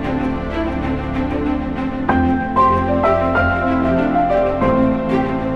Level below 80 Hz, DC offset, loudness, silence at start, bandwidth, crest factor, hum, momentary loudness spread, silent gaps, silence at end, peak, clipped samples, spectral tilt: -30 dBFS; under 0.1%; -17 LUFS; 0 s; 6.8 kHz; 14 dB; none; 6 LU; none; 0 s; -2 dBFS; under 0.1%; -8.5 dB/octave